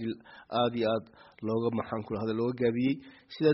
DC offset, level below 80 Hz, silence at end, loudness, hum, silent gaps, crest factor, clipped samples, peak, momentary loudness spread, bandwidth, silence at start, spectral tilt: under 0.1%; -66 dBFS; 0 s; -31 LUFS; none; none; 18 dB; under 0.1%; -14 dBFS; 10 LU; 5.8 kHz; 0 s; -5.5 dB/octave